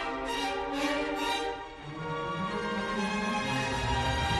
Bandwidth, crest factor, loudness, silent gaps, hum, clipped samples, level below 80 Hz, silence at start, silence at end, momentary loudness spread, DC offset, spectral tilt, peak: 12.5 kHz; 14 dB; -32 LUFS; none; none; under 0.1%; -46 dBFS; 0 s; 0 s; 7 LU; under 0.1%; -4.5 dB/octave; -18 dBFS